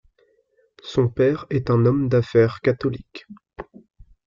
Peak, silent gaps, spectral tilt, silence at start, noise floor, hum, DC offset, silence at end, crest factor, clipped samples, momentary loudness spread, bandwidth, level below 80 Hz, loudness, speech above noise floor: -6 dBFS; none; -8.5 dB/octave; 0.85 s; -63 dBFS; none; under 0.1%; 0.65 s; 18 dB; under 0.1%; 22 LU; 7.2 kHz; -50 dBFS; -20 LUFS; 43 dB